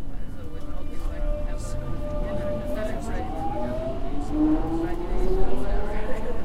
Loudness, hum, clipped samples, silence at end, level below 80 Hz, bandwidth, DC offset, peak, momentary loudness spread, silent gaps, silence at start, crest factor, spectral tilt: -30 LUFS; none; under 0.1%; 0 s; -28 dBFS; 10 kHz; under 0.1%; -6 dBFS; 13 LU; none; 0 s; 16 dB; -7.5 dB/octave